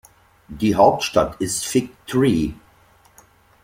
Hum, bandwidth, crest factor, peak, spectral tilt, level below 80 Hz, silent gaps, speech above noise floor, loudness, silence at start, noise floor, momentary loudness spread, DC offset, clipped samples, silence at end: none; 16.5 kHz; 20 dB; -2 dBFS; -5 dB/octave; -44 dBFS; none; 35 dB; -19 LUFS; 0.5 s; -54 dBFS; 9 LU; under 0.1%; under 0.1%; 1.1 s